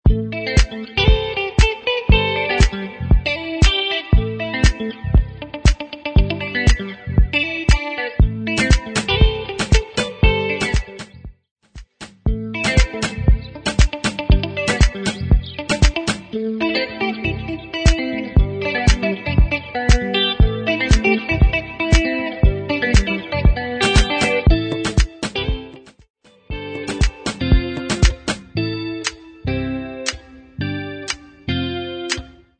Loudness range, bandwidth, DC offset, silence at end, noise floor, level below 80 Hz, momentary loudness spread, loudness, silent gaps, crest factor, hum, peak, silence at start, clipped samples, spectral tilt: 5 LU; 9.4 kHz; under 0.1%; 0.3 s; -39 dBFS; -20 dBFS; 10 LU; -19 LUFS; 11.51-11.56 s, 26.10-26.14 s; 18 dB; none; 0 dBFS; 0.05 s; under 0.1%; -5 dB/octave